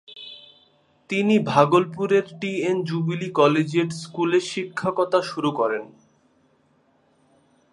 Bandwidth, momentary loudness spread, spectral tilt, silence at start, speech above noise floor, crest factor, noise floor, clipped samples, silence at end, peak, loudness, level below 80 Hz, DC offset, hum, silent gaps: 11.5 kHz; 10 LU; -6 dB/octave; 0.1 s; 41 dB; 22 dB; -62 dBFS; under 0.1%; 1.85 s; -2 dBFS; -22 LUFS; -68 dBFS; under 0.1%; none; none